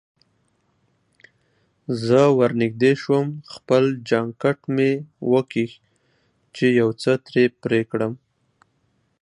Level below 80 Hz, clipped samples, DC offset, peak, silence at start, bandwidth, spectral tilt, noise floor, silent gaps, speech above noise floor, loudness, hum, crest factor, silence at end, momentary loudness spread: -66 dBFS; under 0.1%; under 0.1%; -4 dBFS; 1.9 s; 10.5 kHz; -7 dB/octave; -67 dBFS; none; 47 dB; -21 LUFS; none; 18 dB; 1.05 s; 12 LU